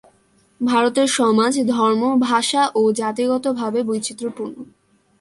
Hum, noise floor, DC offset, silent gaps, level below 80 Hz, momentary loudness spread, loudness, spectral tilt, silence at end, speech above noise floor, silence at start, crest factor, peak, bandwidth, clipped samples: none; -58 dBFS; under 0.1%; none; -66 dBFS; 11 LU; -18 LUFS; -3.5 dB/octave; 0.55 s; 40 dB; 0.6 s; 14 dB; -4 dBFS; 11.5 kHz; under 0.1%